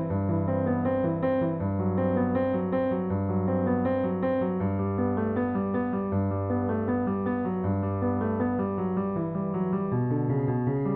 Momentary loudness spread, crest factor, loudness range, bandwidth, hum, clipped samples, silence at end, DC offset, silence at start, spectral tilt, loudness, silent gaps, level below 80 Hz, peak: 2 LU; 14 dB; 1 LU; 4 kHz; none; under 0.1%; 0 s; under 0.1%; 0 s; -9.5 dB/octave; -27 LUFS; none; -56 dBFS; -14 dBFS